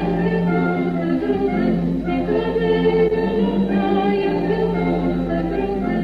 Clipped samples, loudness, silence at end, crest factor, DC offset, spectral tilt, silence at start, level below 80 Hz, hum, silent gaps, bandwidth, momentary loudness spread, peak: under 0.1%; -19 LUFS; 0 s; 14 dB; under 0.1%; -9 dB/octave; 0 s; -36 dBFS; none; none; 5.2 kHz; 4 LU; -6 dBFS